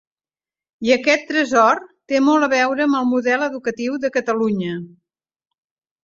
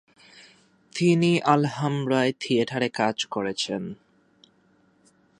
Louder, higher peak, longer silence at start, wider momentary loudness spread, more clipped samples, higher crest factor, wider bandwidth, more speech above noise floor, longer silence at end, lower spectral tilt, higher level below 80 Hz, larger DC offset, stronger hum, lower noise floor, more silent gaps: first, -18 LUFS vs -24 LUFS; first, 0 dBFS vs -4 dBFS; first, 0.8 s vs 0.35 s; about the same, 9 LU vs 11 LU; neither; about the same, 18 dB vs 22 dB; second, 7.6 kHz vs 11 kHz; first, over 72 dB vs 39 dB; second, 1.15 s vs 1.45 s; about the same, -4.5 dB/octave vs -5.5 dB/octave; about the same, -64 dBFS vs -68 dBFS; neither; neither; first, under -90 dBFS vs -62 dBFS; neither